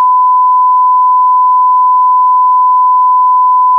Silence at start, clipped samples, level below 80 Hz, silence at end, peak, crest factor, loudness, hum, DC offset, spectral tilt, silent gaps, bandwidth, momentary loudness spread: 0 s; under 0.1%; under -90 dBFS; 0 s; -4 dBFS; 4 dB; -7 LUFS; none; under 0.1%; -3.5 dB/octave; none; 1.2 kHz; 0 LU